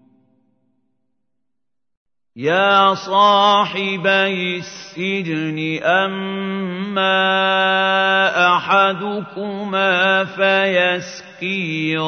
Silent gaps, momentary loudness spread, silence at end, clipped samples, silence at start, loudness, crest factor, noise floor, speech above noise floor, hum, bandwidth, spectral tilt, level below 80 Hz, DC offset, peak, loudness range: none; 11 LU; 0 s; under 0.1%; 2.35 s; -16 LUFS; 16 dB; -82 dBFS; 65 dB; none; 6.6 kHz; -4.5 dB/octave; -70 dBFS; under 0.1%; -2 dBFS; 4 LU